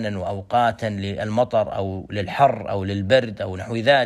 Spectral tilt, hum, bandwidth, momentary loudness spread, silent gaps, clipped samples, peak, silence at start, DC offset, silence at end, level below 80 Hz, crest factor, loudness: -6.5 dB/octave; none; 12 kHz; 9 LU; none; under 0.1%; -4 dBFS; 0 s; under 0.1%; 0 s; -54 dBFS; 18 dB; -22 LUFS